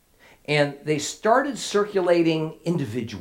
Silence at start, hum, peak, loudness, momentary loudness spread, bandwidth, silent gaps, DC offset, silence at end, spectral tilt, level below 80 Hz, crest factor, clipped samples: 0.5 s; none; -6 dBFS; -23 LUFS; 7 LU; 16.5 kHz; none; under 0.1%; 0 s; -5 dB/octave; -64 dBFS; 18 dB; under 0.1%